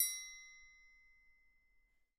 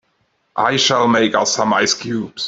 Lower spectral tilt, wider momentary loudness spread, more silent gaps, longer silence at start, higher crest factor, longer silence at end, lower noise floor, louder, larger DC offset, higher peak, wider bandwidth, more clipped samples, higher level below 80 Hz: second, 5.5 dB/octave vs -2.5 dB/octave; first, 25 LU vs 7 LU; neither; second, 0 s vs 0.55 s; first, 26 dB vs 16 dB; first, 1.3 s vs 0 s; first, -75 dBFS vs -64 dBFS; second, -42 LUFS vs -15 LUFS; neither; second, -20 dBFS vs -2 dBFS; first, 16.5 kHz vs 8.2 kHz; neither; second, -78 dBFS vs -60 dBFS